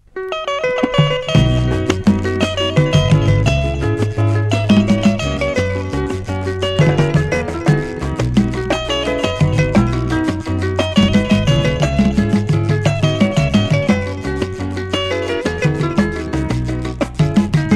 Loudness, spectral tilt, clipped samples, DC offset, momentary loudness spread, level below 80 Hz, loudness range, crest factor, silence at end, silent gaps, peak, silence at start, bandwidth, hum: -16 LUFS; -6.5 dB/octave; under 0.1%; under 0.1%; 7 LU; -28 dBFS; 3 LU; 14 dB; 0 s; none; 0 dBFS; 0.15 s; 11.5 kHz; none